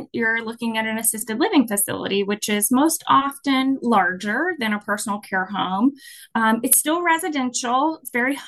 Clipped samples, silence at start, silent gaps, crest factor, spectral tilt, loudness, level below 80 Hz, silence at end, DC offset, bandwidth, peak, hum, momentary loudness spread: under 0.1%; 0 s; none; 20 dB; -2.5 dB/octave; -20 LUFS; -66 dBFS; 0 s; under 0.1%; 13 kHz; -2 dBFS; none; 7 LU